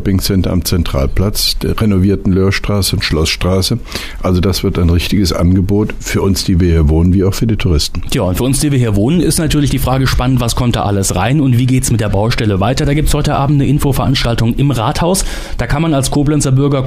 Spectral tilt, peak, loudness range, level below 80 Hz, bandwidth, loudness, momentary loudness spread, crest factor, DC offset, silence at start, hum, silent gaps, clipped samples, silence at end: -5.5 dB/octave; -2 dBFS; 1 LU; -22 dBFS; 15.5 kHz; -13 LUFS; 4 LU; 10 dB; under 0.1%; 0 s; none; none; under 0.1%; 0 s